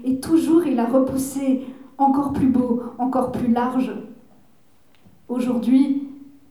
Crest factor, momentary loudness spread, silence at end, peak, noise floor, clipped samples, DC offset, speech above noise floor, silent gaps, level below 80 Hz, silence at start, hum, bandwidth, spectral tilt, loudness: 14 dB; 9 LU; 0.3 s; -6 dBFS; -59 dBFS; under 0.1%; 0.2%; 39 dB; none; -54 dBFS; 0 s; none; 14.5 kHz; -6.5 dB/octave; -20 LUFS